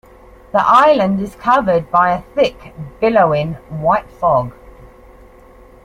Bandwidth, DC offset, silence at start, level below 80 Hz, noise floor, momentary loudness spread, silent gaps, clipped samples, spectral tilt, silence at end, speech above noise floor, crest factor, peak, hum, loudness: 13.5 kHz; under 0.1%; 0.55 s; -42 dBFS; -42 dBFS; 10 LU; none; under 0.1%; -7 dB/octave; 1.35 s; 28 dB; 16 dB; 0 dBFS; none; -15 LUFS